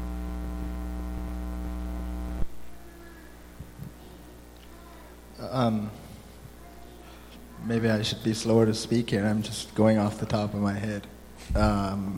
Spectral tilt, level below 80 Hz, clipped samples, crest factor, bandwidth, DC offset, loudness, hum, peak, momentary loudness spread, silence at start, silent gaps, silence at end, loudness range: -6 dB/octave; -38 dBFS; under 0.1%; 20 dB; 16.5 kHz; under 0.1%; -28 LUFS; 60 Hz at -45 dBFS; -8 dBFS; 24 LU; 0 s; none; 0 s; 14 LU